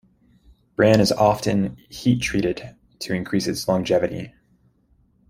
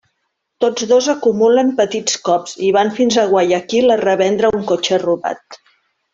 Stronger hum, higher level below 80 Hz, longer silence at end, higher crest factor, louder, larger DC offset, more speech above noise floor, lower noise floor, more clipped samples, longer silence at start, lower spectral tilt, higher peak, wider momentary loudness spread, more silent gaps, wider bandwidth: neither; first, -48 dBFS vs -58 dBFS; first, 1 s vs 0.6 s; first, 20 dB vs 14 dB; second, -21 LUFS vs -15 LUFS; neither; second, 40 dB vs 57 dB; second, -61 dBFS vs -71 dBFS; neither; first, 0.8 s vs 0.6 s; first, -5.5 dB/octave vs -3.5 dB/octave; about the same, -2 dBFS vs -2 dBFS; first, 18 LU vs 6 LU; neither; first, 16 kHz vs 7.8 kHz